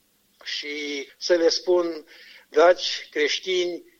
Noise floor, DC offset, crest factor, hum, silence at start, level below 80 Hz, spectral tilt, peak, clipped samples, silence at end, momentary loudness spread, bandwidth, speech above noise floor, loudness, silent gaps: -43 dBFS; under 0.1%; 20 dB; none; 0.45 s; -72 dBFS; -1.5 dB/octave; -6 dBFS; under 0.1%; 0.2 s; 13 LU; 7.4 kHz; 20 dB; -23 LUFS; none